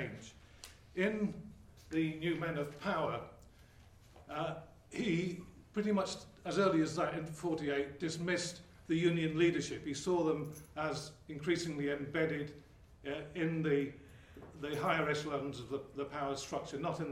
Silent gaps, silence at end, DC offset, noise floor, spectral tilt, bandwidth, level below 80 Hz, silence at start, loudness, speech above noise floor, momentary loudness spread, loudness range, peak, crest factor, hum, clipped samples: none; 0 s; under 0.1%; -60 dBFS; -5.5 dB/octave; 15 kHz; -64 dBFS; 0 s; -37 LUFS; 24 dB; 16 LU; 4 LU; -18 dBFS; 20 dB; none; under 0.1%